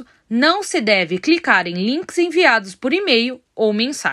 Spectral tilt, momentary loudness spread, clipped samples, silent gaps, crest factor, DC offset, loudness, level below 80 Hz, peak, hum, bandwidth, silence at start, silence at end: -3.5 dB/octave; 7 LU; under 0.1%; none; 18 dB; under 0.1%; -17 LUFS; -66 dBFS; 0 dBFS; none; 13 kHz; 0 s; 0 s